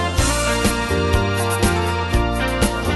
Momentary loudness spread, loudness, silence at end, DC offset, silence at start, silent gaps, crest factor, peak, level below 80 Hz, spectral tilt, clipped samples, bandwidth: 2 LU; -19 LUFS; 0 s; under 0.1%; 0 s; none; 16 dB; -2 dBFS; -26 dBFS; -4.5 dB/octave; under 0.1%; 12.5 kHz